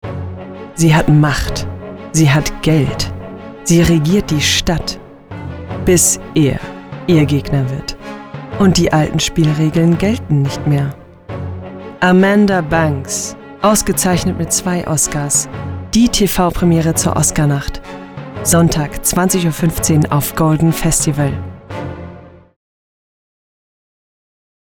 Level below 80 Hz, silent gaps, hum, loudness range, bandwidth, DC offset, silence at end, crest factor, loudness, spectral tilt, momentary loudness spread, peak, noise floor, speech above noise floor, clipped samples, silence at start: -32 dBFS; none; none; 2 LU; over 20 kHz; under 0.1%; 2.4 s; 14 dB; -14 LUFS; -4.5 dB/octave; 17 LU; 0 dBFS; -36 dBFS; 23 dB; under 0.1%; 0.05 s